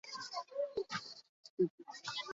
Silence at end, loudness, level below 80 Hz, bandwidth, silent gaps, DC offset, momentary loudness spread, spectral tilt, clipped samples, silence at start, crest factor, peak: 0 s; -41 LUFS; -82 dBFS; 7.6 kHz; 1.29-1.43 s, 1.50-1.57 s, 1.70-1.78 s; under 0.1%; 14 LU; -3 dB/octave; under 0.1%; 0.05 s; 18 dB; -22 dBFS